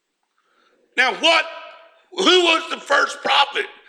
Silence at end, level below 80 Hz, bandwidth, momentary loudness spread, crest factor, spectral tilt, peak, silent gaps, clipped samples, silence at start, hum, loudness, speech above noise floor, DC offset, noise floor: 0.2 s; -74 dBFS; 12.5 kHz; 13 LU; 18 dB; -1 dB/octave; -2 dBFS; none; under 0.1%; 0.95 s; none; -17 LUFS; 51 dB; under 0.1%; -69 dBFS